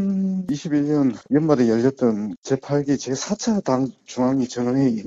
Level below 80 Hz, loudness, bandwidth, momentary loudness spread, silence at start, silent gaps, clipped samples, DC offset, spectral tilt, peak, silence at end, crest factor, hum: -58 dBFS; -21 LUFS; 8 kHz; 7 LU; 0 s; 2.38-2.43 s; under 0.1%; under 0.1%; -6.5 dB/octave; -4 dBFS; 0 s; 16 dB; none